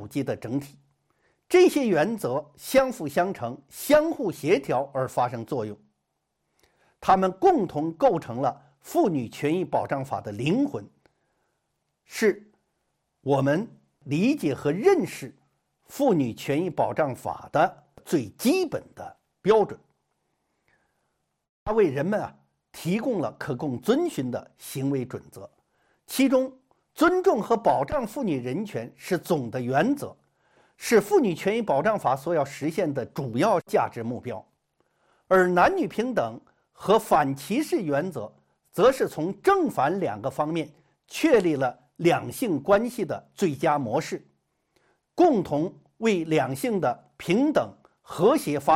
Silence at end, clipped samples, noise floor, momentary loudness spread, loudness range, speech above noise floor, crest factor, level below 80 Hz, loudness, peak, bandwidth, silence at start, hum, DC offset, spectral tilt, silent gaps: 0 s; under 0.1%; -78 dBFS; 14 LU; 5 LU; 54 dB; 18 dB; -60 dBFS; -25 LUFS; -6 dBFS; 16.5 kHz; 0 s; none; under 0.1%; -6 dB/octave; 21.49-21.66 s